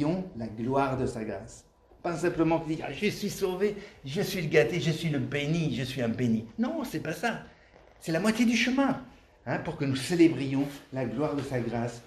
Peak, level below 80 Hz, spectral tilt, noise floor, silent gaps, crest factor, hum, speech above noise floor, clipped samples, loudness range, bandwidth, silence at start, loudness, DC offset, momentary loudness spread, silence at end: -10 dBFS; -56 dBFS; -6 dB/octave; -56 dBFS; none; 20 dB; none; 27 dB; under 0.1%; 3 LU; 14 kHz; 0 s; -29 LUFS; under 0.1%; 11 LU; 0 s